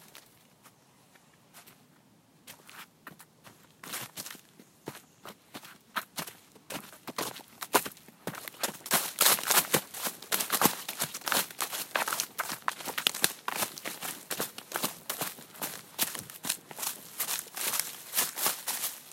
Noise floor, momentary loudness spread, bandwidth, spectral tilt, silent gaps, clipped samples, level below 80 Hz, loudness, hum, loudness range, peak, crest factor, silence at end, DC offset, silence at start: -62 dBFS; 21 LU; 16.5 kHz; -0.5 dB/octave; none; under 0.1%; -78 dBFS; -31 LUFS; none; 17 LU; -2 dBFS; 32 dB; 0 s; under 0.1%; 0 s